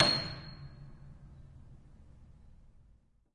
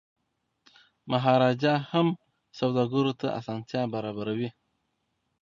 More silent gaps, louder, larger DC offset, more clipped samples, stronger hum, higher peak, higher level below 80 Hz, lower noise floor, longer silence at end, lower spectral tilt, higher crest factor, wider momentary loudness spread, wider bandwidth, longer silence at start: neither; second, -34 LUFS vs -27 LUFS; neither; neither; neither; about the same, -10 dBFS vs -8 dBFS; first, -56 dBFS vs -70 dBFS; second, -65 dBFS vs -77 dBFS; about the same, 0.85 s vs 0.9 s; second, -4 dB/octave vs -7.5 dB/octave; first, 28 dB vs 20 dB; first, 25 LU vs 11 LU; first, 11.5 kHz vs 7.4 kHz; second, 0 s vs 1.05 s